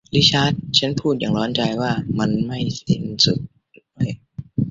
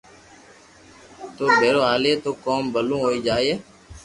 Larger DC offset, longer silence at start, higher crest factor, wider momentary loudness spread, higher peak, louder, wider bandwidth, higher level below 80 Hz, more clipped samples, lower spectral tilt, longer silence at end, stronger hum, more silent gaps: neither; second, 0.1 s vs 1.1 s; about the same, 18 dB vs 20 dB; about the same, 11 LU vs 11 LU; about the same, -2 dBFS vs -4 dBFS; about the same, -20 LUFS vs -21 LUFS; second, 7.8 kHz vs 11.5 kHz; about the same, -48 dBFS vs -52 dBFS; neither; about the same, -5 dB/octave vs -4.5 dB/octave; about the same, 0 s vs 0.05 s; neither; neither